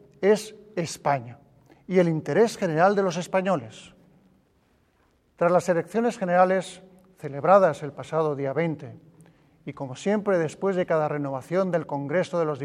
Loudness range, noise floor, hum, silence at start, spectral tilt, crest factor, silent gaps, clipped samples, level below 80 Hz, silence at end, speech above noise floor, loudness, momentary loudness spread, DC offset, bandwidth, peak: 4 LU; -65 dBFS; none; 0.2 s; -6.5 dB/octave; 20 dB; none; under 0.1%; -68 dBFS; 0 s; 41 dB; -24 LUFS; 15 LU; under 0.1%; 13.5 kHz; -4 dBFS